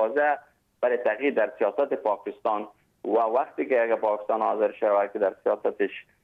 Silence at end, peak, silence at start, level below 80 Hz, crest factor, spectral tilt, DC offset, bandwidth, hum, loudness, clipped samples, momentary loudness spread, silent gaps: 0.2 s; -12 dBFS; 0 s; -76 dBFS; 14 dB; -7 dB/octave; under 0.1%; 4.6 kHz; none; -26 LUFS; under 0.1%; 6 LU; none